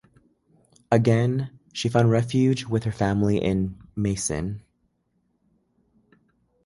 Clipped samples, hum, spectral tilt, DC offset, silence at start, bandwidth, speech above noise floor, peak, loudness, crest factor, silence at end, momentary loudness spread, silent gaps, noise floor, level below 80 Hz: under 0.1%; none; -6.5 dB/octave; under 0.1%; 0.9 s; 11.5 kHz; 48 dB; -4 dBFS; -24 LUFS; 20 dB; 2.05 s; 10 LU; none; -71 dBFS; -48 dBFS